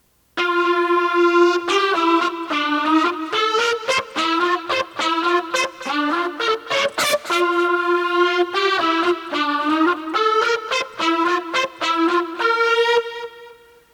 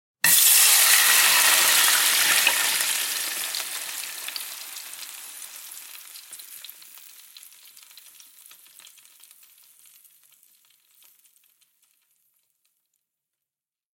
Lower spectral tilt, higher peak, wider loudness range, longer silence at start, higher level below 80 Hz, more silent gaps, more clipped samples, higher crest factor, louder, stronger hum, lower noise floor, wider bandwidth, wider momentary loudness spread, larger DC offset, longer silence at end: first, -2 dB/octave vs 3 dB/octave; about the same, -4 dBFS vs -2 dBFS; second, 2 LU vs 27 LU; about the same, 0.35 s vs 0.25 s; first, -66 dBFS vs -82 dBFS; neither; neither; second, 16 dB vs 24 dB; about the same, -19 LUFS vs -17 LUFS; neither; second, -45 dBFS vs -90 dBFS; about the same, 18 kHz vs 17 kHz; second, 5 LU vs 26 LU; neither; second, 0.4 s vs 7.3 s